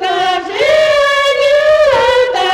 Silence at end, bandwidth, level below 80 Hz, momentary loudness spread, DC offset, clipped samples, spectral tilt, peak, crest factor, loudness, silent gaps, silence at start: 0 s; 13 kHz; -42 dBFS; 5 LU; under 0.1%; under 0.1%; -2 dB/octave; -2 dBFS; 8 dB; -10 LUFS; none; 0 s